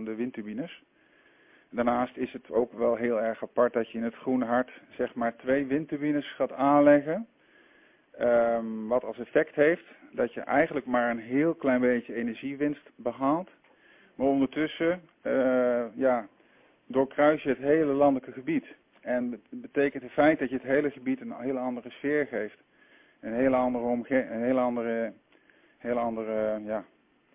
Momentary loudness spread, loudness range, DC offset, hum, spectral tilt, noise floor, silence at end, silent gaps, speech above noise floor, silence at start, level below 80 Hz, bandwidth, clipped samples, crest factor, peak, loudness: 11 LU; 4 LU; under 0.1%; none; -10 dB/octave; -62 dBFS; 0.5 s; none; 34 dB; 0 s; -64 dBFS; 3.8 kHz; under 0.1%; 20 dB; -8 dBFS; -28 LUFS